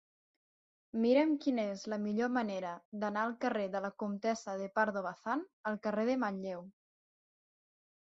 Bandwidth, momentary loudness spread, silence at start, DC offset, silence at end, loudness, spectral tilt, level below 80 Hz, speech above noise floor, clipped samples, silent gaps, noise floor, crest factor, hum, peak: 7.6 kHz; 10 LU; 0.95 s; under 0.1%; 1.4 s; -35 LUFS; -4.5 dB/octave; -80 dBFS; over 55 dB; under 0.1%; 2.85-2.92 s, 5.53-5.64 s; under -90 dBFS; 18 dB; none; -18 dBFS